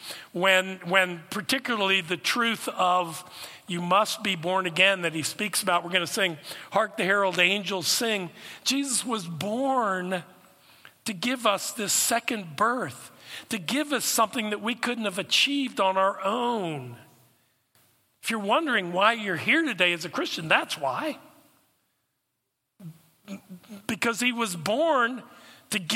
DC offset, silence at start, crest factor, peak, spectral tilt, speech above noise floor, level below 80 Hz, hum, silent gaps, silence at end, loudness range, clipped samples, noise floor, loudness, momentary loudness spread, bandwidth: under 0.1%; 0 s; 22 dB; -4 dBFS; -2.5 dB/octave; 53 dB; -78 dBFS; none; none; 0 s; 4 LU; under 0.1%; -80 dBFS; -25 LUFS; 13 LU; 16.5 kHz